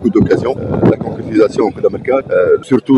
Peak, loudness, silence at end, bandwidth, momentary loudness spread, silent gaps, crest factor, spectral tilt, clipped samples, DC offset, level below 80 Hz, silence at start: 0 dBFS; -13 LUFS; 0 s; 11 kHz; 5 LU; none; 12 dB; -8.5 dB/octave; under 0.1%; under 0.1%; -38 dBFS; 0 s